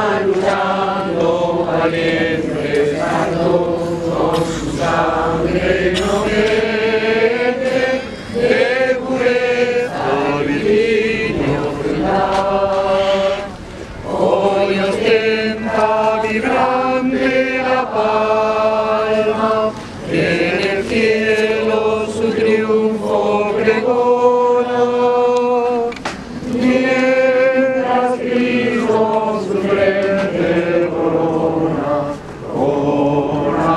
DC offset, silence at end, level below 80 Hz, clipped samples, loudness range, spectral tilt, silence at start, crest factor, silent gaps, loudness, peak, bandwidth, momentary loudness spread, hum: under 0.1%; 0 s; -40 dBFS; under 0.1%; 2 LU; -6 dB/octave; 0 s; 16 dB; none; -16 LUFS; 0 dBFS; 12 kHz; 5 LU; none